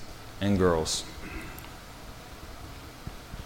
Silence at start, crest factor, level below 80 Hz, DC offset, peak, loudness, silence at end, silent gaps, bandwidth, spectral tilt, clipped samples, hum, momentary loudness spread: 0 s; 20 dB; -46 dBFS; under 0.1%; -12 dBFS; -29 LUFS; 0 s; none; 17 kHz; -4.5 dB/octave; under 0.1%; none; 20 LU